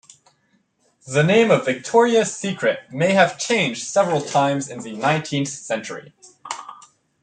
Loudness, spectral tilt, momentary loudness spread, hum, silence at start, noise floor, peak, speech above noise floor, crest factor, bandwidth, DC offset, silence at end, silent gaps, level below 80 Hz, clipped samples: -19 LUFS; -4.5 dB/octave; 17 LU; none; 1.05 s; -64 dBFS; -2 dBFS; 45 dB; 18 dB; 9.6 kHz; under 0.1%; 0.5 s; none; -66 dBFS; under 0.1%